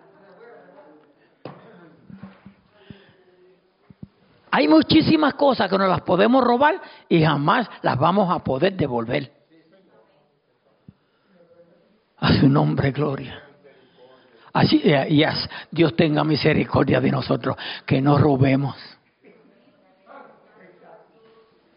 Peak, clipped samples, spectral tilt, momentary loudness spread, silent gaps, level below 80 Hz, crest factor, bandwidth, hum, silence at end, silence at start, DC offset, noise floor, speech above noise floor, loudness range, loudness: -6 dBFS; under 0.1%; -5 dB/octave; 11 LU; none; -52 dBFS; 16 dB; 5.4 kHz; none; 1.55 s; 1.45 s; under 0.1%; -64 dBFS; 45 dB; 8 LU; -19 LUFS